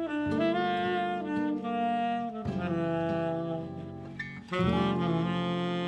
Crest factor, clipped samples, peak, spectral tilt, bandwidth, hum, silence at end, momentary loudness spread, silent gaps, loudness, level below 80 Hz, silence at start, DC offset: 14 dB; under 0.1%; -16 dBFS; -7.5 dB/octave; 8.8 kHz; none; 0 s; 10 LU; none; -31 LUFS; -56 dBFS; 0 s; under 0.1%